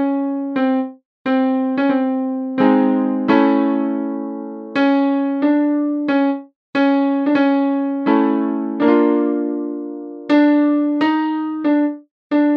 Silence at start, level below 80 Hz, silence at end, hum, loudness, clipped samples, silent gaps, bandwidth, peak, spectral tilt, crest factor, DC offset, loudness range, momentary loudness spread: 0 s; -74 dBFS; 0 s; none; -17 LUFS; under 0.1%; 1.05-1.25 s, 6.56-6.73 s, 12.11-12.30 s; 5.2 kHz; -2 dBFS; -8 dB/octave; 16 dB; under 0.1%; 1 LU; 10 LU